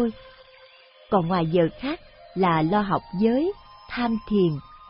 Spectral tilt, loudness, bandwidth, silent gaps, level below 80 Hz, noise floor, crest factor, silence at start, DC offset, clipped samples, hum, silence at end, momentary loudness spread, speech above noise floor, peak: -11.5 dB/octave; -24 LUFS; 5.6 kHz; none; -50 dBFS; -52 dBFS; 18 dB; 0 s; under 0.1%; under 0.1%; none; 0.05 s; 11 LU; 29 dB; -6 dBFS